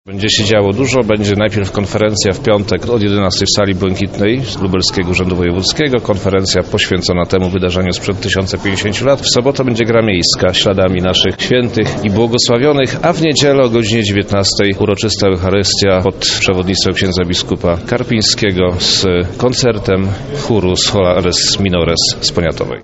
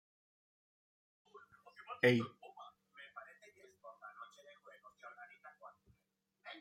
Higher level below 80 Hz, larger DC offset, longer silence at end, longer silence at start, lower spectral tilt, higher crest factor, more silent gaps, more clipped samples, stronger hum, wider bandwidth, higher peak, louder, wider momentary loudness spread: first, -34 dBFS vs -86 dBFS; first, 0.3% vs under 0.1%; about the same, 0 s vs 0 s; second, 0.05 s vs 1.35 s; second, -4.5 dB/octave vs -6.5 dB/octave; second, 12 dB vs 26 dB; neither; neither; neither; second, 8.2 kHz vs 16 kHz; first, 0 dBFS vs -18 dBFS; first, -12 LUFS vs -35 LUFS; second, 4 LU vs 28 LU